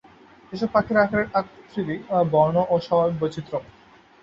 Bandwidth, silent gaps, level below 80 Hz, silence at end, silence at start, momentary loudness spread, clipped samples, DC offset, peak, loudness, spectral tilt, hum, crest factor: 7.6 kHz; none; -54 dBFS; 0.6 s; 0.5 s; 13 LU; under 0.1%; under 0.1%; -4 dBFS; -23 LUFS; -8 dB/octave; none; 18 dB